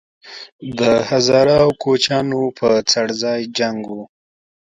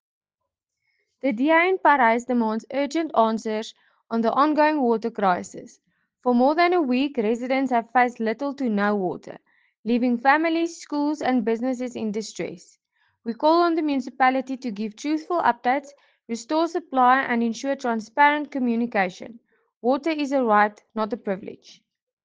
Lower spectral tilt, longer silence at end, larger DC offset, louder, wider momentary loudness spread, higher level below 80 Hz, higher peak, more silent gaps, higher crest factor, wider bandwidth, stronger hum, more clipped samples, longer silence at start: about the same, -4 dB/octave vs -5 dB/octave; about the same, 0.7 s vs 0.7 s; neither; first, -16 LUFS vs -23 LUFS; first, 19 LU vs 12 LU; first, -52 dBFS vs -72 dBFS; first, 0 dBFS vs -4 dBFS; about the same, 0.52-0.59 s vs 9.77-9.83 s, 19.76-19.81 s; about the same, 16 dB vs 18 dB; first, 10.5 kHz vs 9.4 kHz; neither; neither; second, 0.25 s vs 1.25 s